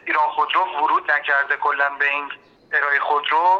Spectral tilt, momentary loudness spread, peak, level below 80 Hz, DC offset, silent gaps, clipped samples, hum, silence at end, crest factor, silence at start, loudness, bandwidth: -2.5 dB/octave; 5 LU; -6 dBFS; -72 dBFS; under 0.1%; none; under 0.1%; none; 0 s; 14 dB; 0.05 s; -19 LUFS; 7 kHz